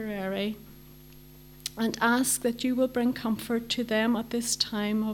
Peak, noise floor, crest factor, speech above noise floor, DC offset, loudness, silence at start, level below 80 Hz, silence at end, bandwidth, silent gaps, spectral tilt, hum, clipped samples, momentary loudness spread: -10 dBFS; -50 dBFS; 20 dB; 22 dB; under 0.1%; -28 LUFS; 0 s; -58 dBFS; 0 s; 19 kHz; none; -3 dB/octave; none; under 0.1%; 8 LU